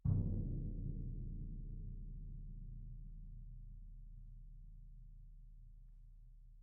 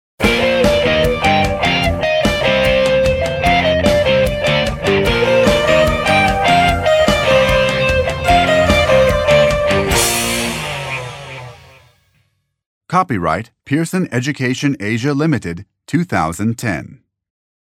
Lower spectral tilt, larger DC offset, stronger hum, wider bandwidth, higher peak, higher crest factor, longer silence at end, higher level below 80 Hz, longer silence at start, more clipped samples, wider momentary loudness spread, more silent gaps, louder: first, -15 dB/octave vs -4.5 dB/octave; neither; neither; second, 1.3 kHz vs 17 kHz; second, -24 dBFS vs 0 dBFS; first, 22 dB vs 14 dB; second, 0 s vs 0.75 s; second, -48 dBFS vs -30 dBFS; second, 0.05 s vs 0.2 s; neither; first, 20 LU vs 9 LU; second, none vs 12.66-12.81 s; second, -48 LUFS vs -14 LUFS